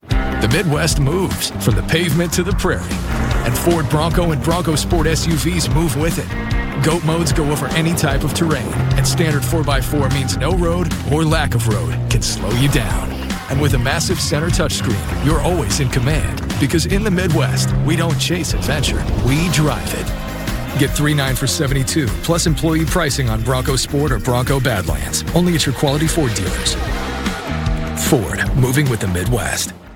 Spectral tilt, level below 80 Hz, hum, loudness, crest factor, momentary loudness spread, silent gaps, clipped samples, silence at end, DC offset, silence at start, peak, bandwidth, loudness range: -5 dB/octave; -24 dBFS; none; -17 LUFS; 16 dB; 5 LU; none; under 0.1%; 0 s; under 0.1%; 0.05 s; 0 dBFS; 17.5 kHz; 1 LU